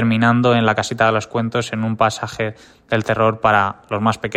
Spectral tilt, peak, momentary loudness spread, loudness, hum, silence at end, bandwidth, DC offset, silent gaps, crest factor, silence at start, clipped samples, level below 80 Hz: -6 dB/octave; 0 dBFS; 8 LU; -18 LUFS; none; 0 s; 13.5 kHz; under 0.1%; none; 16 dB; 0 s; under 0.1%; -50 dBFS